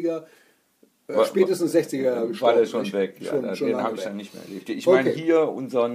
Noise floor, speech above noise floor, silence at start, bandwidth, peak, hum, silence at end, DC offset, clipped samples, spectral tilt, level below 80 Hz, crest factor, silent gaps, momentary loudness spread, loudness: -62 dBFS; 39 dB; 0 s; 15.5 kHz; -6 dBFS; none; 0 s; under 0.1%; under 0.1%; -5.5 dB/octave; -78 dBFS; 18 dB; none; 13 LU; -23 LUFS